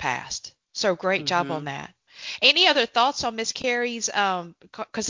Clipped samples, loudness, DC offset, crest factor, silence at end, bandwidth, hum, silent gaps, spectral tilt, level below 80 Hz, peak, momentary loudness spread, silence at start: under 0.1%; -22 LUFS; under 0.1%; 22 dB; 0 s; 7.6 kHz; none; none; -2 dB/octave; -62 dBFS; -2 dBFS; 19 LU; 0 s